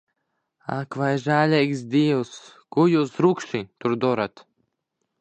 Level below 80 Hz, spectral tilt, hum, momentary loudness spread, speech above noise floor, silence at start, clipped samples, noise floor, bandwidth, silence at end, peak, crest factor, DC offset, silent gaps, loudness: -68 dBFS; -7 dB/octave; none; 12 LU; 56 dB; 0.7 s; under 0.1%; -78 dBFS; 9 kHz; 0.9 s; -4 dBFS; 18 dB; under 0.1%; none; -23 LUFS